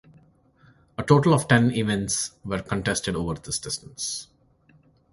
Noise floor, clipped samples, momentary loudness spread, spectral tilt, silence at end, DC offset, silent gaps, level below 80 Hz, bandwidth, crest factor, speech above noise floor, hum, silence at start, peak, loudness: -59 dBFS; under 0.1%; 13 LU; -4.5 dB/octave; 0.9 s; under 0.1%; none; -50 dBFS; 11.5 kHz; 24 dB; 36 dB; none; 1 s; -2 dBFS; -24 LUFS